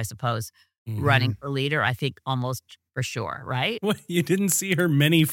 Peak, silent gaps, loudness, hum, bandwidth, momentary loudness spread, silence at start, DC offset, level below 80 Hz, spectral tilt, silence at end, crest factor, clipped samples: -4 dBFS; 0.78-0.86 s; -24 LUFS; none; 17 kHz; 11 LU; 0 s; under 0.1%; -60 dBFS; -4.5 dB/octave; 0 s; 22 dB; under 0.1%